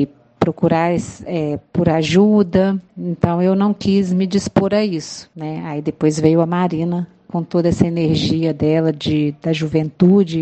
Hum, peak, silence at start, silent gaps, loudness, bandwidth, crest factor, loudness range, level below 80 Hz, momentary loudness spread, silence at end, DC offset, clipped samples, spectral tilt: none; 0 dBFS; 0 s; none; -17 LUFS; 8.8 kHz; 16 dB; 2 LU; -46 dBFS; 11 LU; 0 s; under 0.1%; under 0.1%; -7 dB/octave